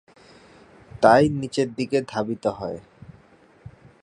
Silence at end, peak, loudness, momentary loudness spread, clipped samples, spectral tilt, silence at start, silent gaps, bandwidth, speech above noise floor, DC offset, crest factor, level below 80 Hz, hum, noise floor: 1.25 s; 0 dBFS; -22 LUFS; 17 LU; under 0.1%; -6 dB/octave; 0.95 s; none; 11 kHz; 33 dB; under 0.1%; 24 dB; -54 dBFS; none; -54 dBFS